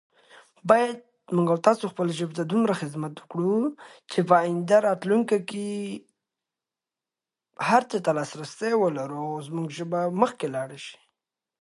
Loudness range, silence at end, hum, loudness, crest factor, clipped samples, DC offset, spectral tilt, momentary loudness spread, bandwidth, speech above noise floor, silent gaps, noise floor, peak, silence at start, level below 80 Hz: 4 LU; 0.65 s; none; -25 LUFS; 24 dB; under 0.1%; under 0.1%; -6 dB/octave; 12 LU; 11.5 kHz; 65 dB; none; -90 dBFS; -2 dBFS; 0.65 s; -76 dBFS